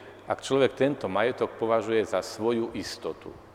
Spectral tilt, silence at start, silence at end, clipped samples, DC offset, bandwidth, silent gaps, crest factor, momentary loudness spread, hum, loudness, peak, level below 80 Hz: -5 dB/octave; 0 s; 0.05 s; under 0.1%; under 0.1%; 15 kHz; none; 18 dB; 10 LU; none; -28 LUFS; -8 dBFS; -62 dBFS